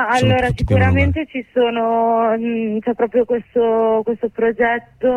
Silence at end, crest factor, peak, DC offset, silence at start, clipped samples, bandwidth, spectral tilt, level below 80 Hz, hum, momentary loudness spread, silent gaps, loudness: 0 s; 12 dB; -4 dBFS; under 0.1%; 0 s; under 0.1%; 11 kHz; -7.5 dB/octave; -34 dBFS; none; 6 LU; none; -17 LUFS